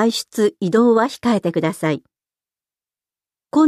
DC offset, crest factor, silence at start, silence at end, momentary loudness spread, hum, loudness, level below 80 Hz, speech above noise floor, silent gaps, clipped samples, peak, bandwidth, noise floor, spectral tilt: under 0.1%; 14 dB; 0 s; 0 s; 8 LU; none; -18 LUFS; -64 dBFS; over 72 dB; none; under 0.1%; -4 dBFS; 14.5 kHz; under -90 dBFS; -5.5 dB/octave